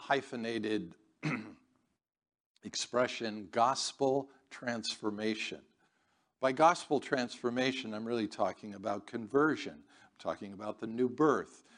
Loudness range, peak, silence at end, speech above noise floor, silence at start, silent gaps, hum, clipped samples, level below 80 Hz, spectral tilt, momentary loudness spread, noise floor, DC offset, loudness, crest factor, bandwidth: 3 LU; -12 dBFS; 0.2 s; 42 dB; 0 s; 2.40-2.55 s; none; under 0.1%; -80 dBFS; -4 dB/octave; 12 LU; -76 dBFS; under 0.1%; -34 LUFS; 22 dB; 10 kHz